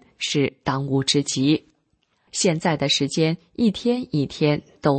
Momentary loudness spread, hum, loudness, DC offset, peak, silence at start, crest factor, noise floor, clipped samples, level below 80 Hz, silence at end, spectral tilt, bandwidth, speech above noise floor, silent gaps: 5 LU; none; -22 LUFS; under 0.1%; -6 dBFS; 0.2 s; 16 dB; -68 dBFS; under 0.1%; -56 dBFS; 0 s; -4.5 dB/octave; 8.8 kHz; 46 dB; none